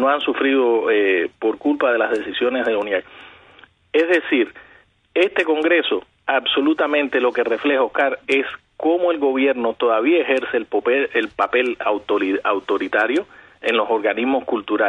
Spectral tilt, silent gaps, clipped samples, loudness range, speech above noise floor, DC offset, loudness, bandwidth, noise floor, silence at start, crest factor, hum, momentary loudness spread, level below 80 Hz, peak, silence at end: -4.5 dB/octave; none; under 0.1%; 2 LU; 33 dB; under 0.1%; -19 LUFS; 9.8 kHz; -52 dBFS; 0 s; 14 dB; none; 5 LU; -64 dBFS; -4 dBFS; 0 s